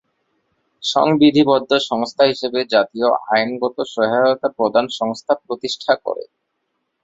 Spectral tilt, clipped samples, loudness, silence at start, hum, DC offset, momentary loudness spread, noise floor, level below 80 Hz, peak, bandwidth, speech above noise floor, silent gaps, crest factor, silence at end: -5 dB/octave; under 0.1%; -18 LUFS; 0.8 s; none; under 0.1%; 10 LU; -72 dBFS; -60 dBFS; -2 dBFS; 7.8 kHz; 55 dB; none; 16 dB; 0.8 s